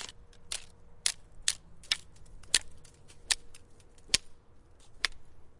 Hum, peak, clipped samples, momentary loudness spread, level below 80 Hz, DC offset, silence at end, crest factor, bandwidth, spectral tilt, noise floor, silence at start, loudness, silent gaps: none; -6 dBFS; under 0.1%; 11 LU; -54 dBFS; under 0.1%; 0 s; 32 dB; 11.5 kHz; 1 dB/octave; -55 dBFS; 0 s; -33 LUFS; none